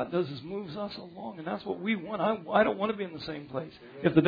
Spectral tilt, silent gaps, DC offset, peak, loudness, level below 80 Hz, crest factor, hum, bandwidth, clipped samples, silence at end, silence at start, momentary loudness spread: -5 dB/octave; none; under 0.1%; -8 dBFS; -32 LUFS; -64 dBFS; 22 dB; none; 5 kHz; under 0.1%; 0 s; 0 s; 13 LU